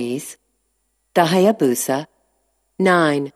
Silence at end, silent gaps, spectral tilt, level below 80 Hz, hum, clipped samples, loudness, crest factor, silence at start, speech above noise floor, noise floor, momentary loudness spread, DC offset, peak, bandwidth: 0.05 s; none; -5 dB/octave; -72 dBFS; none; under 0.1%; -18 LUFS; 18 dB; 0 s; 52 dB; -69 dBFS; 14 LU; under 0.1%; 0 dBFS; 14.5 kHz